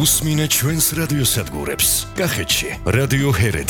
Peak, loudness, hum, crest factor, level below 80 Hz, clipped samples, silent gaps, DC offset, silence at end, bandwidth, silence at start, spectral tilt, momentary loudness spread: -4 dBFS; -17 LUFS; none; 14 dB; -34 dBFS; under 0.1%; none; under 0.1%; 0 s; over 20 kHz; 0 s; -3.5 dB/octave; 5 LU